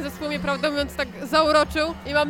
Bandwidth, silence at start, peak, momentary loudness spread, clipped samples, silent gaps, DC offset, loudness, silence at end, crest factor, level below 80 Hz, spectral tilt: 17 kHz; 0 s; -4 dBFS; 9 LU; under 0.1%; none; under 0.1%; -23 LUFS; 0 s; 18 dB; -42 dBFS; -4.5 dB/octave